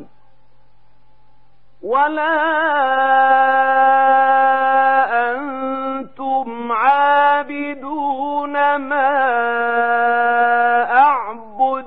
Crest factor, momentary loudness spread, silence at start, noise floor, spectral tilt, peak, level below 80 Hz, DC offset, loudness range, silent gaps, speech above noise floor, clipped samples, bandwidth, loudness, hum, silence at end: 14 dB; 10 LU; 0 s; -58 dBFS; -6.5 dB/octave; -2 dBFS; -62 dBFS; 1%; 4 LU; none; 42 dB; under 0.1%; 4.3 kHz; -16 LUFS; none; 0 s